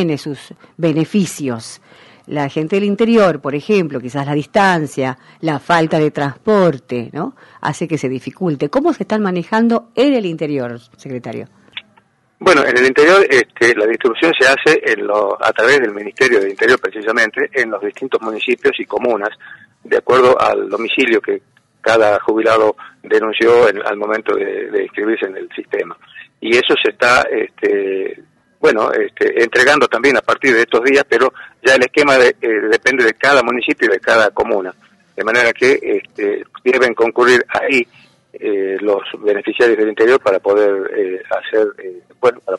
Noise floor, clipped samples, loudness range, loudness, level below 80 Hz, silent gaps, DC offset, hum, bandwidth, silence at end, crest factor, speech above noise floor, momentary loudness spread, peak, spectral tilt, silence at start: -54 dBFS; under 0.1%; 5 LU; -14 LUFS; -54 dBFS; none; under 0.1%; none; 11.5 kHz; 0 s; 14 dB; 40 dB; 12 LU; 0 dBFS; -5 dB/octave; 0 s